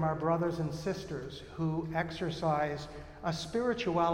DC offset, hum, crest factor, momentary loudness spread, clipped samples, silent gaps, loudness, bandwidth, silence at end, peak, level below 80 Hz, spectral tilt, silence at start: under 0.1%; none; 16 dB; 10 LU; under 0.1%; none; -34 LUFS; 11 kHz; 0 s; -18 dBFS; -54 dBFS; -6.5 dB/octave; 0 s